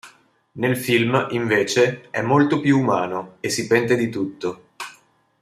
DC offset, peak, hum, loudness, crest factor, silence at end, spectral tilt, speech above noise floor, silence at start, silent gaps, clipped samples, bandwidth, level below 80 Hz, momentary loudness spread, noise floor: under 0.1%; -4 dBFS; none; -20 LUFS; 18 dB; 0.5 s; -5 dB/octave; 35 dB; 0.05 s; none; under 0.1%; 15 kHz; -62 dBFS; 12 LU; -55 dBFS